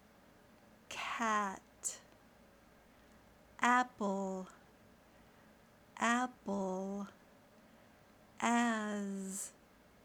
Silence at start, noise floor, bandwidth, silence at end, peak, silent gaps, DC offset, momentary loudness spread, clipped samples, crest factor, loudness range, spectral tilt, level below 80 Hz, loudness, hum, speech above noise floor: 0.9 s; -64 dBFS; over 20 kHz; 0.5 s; -16 dBFS; none; under 0.1%; 15 LU; under 0.1%; 24 dB; 3 LU; -3.5 dB/octave; -74 dBFS; -37 LUFS; none; 27 dB